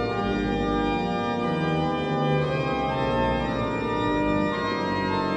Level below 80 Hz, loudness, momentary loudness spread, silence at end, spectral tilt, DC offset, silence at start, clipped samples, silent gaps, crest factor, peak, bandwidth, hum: -40 dBFS; -25 LUFS; 2 LU; 0 s; -7 dB/octave; under 0.1%; 0 s; under 0.1%; none; 12 dB; -12 dBFS; 9.6 kHz; none